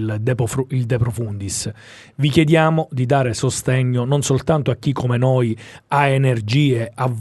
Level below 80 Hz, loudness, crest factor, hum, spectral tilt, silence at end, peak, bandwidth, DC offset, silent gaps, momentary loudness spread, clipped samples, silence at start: -46 dBFS; -18 LUFS; 18 dB; none; -6 dB/octave; 0 s; 0 dBFS; 12 kHz; under 0.1%; none; 8 LU; under 0.1%; 0 s